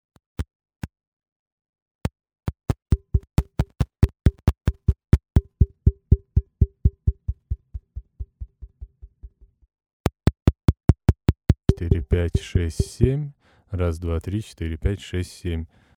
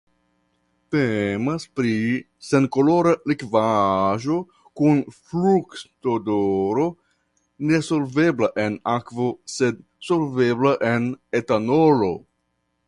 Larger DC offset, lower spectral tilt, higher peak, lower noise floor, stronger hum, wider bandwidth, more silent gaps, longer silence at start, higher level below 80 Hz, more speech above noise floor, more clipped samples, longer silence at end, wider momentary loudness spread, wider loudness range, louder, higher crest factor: neither; first, -8 dB/octave vs -6.5 dB/octave; about the same, -2 dBFS vs -4 dBFS; second, -47 dBFS vs -72 dBFS; neither; first, 13 kHz vs 11.5 kHz; first, 0.55-0.60 s, 1.07-1.17 s, 1.32-1.58 s, 1.69-1.73 s, 1.82-1.99 s, 9.93-10.04 s vs none; second, 0.4 s vs 0.9 s; first, -28 dBFS vs -56 dBFS; second, 23 dB vs 51 dB; neither; second, 0.3 s vs 0.7 s; first, 18 LU vs 8 LU; first, 7 LU vs 2 LU; second, -24 LUFS vs -21 LUFS; about the same, 20 dB vs 18 dB